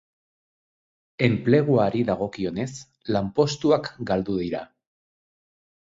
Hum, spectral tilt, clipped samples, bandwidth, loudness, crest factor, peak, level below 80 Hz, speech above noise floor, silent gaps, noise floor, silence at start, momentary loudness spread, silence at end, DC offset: none; -6.5 dB/octave; under 0.1%; 7.8 kHz; -24 LUFS; 20 dB; -6 dBFS; -54 dBFS; over 67 dB; none; under -90 dBFS; 1.2 s; 12 LU; 1.2 s; under 0.1%